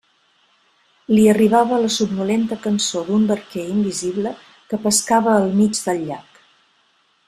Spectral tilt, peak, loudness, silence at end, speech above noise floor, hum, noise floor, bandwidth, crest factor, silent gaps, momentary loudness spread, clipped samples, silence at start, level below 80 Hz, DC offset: -4.5 dB/octave; -2 dBFS; -18 LUFS; 1.05 s; 43 dB; none; -61 dBFS; 14 kHz; 18 dB; none; 11 LU; under 0.1%; 1.1 s; -58 dBFS; under 0.1%